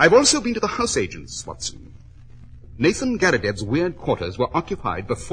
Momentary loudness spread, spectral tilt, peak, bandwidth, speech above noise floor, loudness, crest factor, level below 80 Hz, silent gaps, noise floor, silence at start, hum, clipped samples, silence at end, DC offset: 12 LU; -3.5 dB/octave; -2 dBFS; 10.5 kHz; 21 dB; -21 LUFS; 20 dB; -44 dBFS; none; -42 dBFS; 0 s; none; under 0.1%; 0 s; under 0.1%